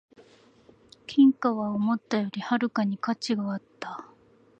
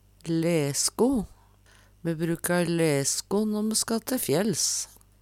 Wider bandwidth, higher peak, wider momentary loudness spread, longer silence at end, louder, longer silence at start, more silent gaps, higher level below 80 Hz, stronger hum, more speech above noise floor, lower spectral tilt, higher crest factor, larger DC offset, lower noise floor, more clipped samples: second, 8.6 kHz vs 17.5 kHz; about the same, -10 dBFS vs -8 dBFS; first, 18 LU vs 7 LU; first, 0.55 s vs 0.35 s; about the same, -26 LUFS vs -26 LUFS; first, 1.1 s vs 0.25 s; neither; second, -72 dBFS vs -56 dBFS; second, none vs 50 Hz at -55 dBFS; about the same, 33 dB vs 31 dB; first, -6 dB/octave vs -4 dB/octave; about the same, 18 dB vs 18 dB; neither; about the same, -58 dBFS vs -57 dBFS; neither